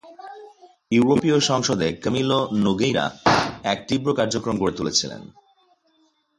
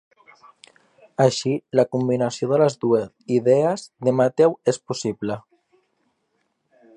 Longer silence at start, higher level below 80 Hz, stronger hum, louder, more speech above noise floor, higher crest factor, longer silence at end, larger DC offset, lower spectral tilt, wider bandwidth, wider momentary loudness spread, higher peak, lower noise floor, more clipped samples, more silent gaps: second, 0.05 s vs 1.2 s; first, -52 dBFS vs -66 dBFS; neither; about the same, -21 LUFS vs -21 LUFS; second, 43 dB vs 51 dB; about the same, 20 dB vs 18 dB; second, 1.1 s vs 1.55 s; neither; second, -4.5 dB/octave vs -6 dB/octave; about the same, 11.5 kHz vs 10.5 kHz; about the same, 9 LU vs 9 LU; about the same, -2 dBFS vs -4 dBFS; second, -64 dBFS vs -71 dBFS; neither; neither